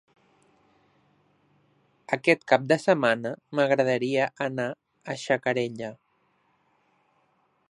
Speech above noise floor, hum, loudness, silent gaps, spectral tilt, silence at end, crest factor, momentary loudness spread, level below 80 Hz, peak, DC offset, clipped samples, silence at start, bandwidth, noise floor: 44 dB; none; -25 LUFS; none; -5.5 dB/octave; 1.75 s; 24 dB; 13 LU; -76 dBFS; -4 dBFS; under 0.1%; under 0.1%; 2.1 s; 11 kHz; -69 dBFS